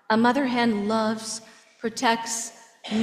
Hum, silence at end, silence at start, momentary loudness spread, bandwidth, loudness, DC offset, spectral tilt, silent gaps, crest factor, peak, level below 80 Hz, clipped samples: none; 0 s; 0.1 s; 13 LU; 15 kHz; -25 LUFS; under 0.1%; -3.5 dB/octave; none; 18 dB; -6 dBFS; -66 dBFS; under 0.1%